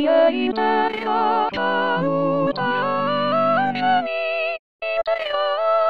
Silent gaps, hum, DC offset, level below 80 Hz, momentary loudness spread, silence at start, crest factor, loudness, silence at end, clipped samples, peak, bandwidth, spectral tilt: 4.59-4.79 s; none; 0.7%; -58 dBFS; 5 LU; 0 s; 16 dB; -20 LUFS; 0 s; under 0.1%; -4 dBFS; 6.2 kHz; -7.5 dB/octave